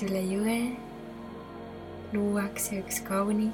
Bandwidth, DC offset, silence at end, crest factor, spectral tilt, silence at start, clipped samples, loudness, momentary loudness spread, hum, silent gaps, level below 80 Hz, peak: 19 kHz; under 0.1%; 0 s; 14 dB; -5 dB/octave; 0 s; under 0.1%; -30 LUFS; 14 LU; none; none; -56 dBFS; -16 dBFS